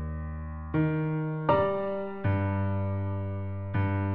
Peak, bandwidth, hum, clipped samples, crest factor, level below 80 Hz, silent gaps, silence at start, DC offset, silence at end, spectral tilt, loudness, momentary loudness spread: -12 dBFS; 4.3 kHz; none; under 0.1%; 18 dB; -46 dBFS; none; 0 s; under 0.1%; 0 s; -8 dB/octave; -30 LUFS; 10 LU